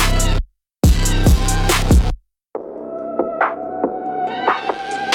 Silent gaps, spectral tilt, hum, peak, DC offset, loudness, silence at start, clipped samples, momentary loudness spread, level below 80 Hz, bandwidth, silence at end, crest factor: none; -4.5 dB/octave; none; -2 dBFS; under 0.1%; -18 LUFS; 0 s; under 0.1%; 14 LU; -20 dBFS; 17.5 kHz; 0 s; 14 dB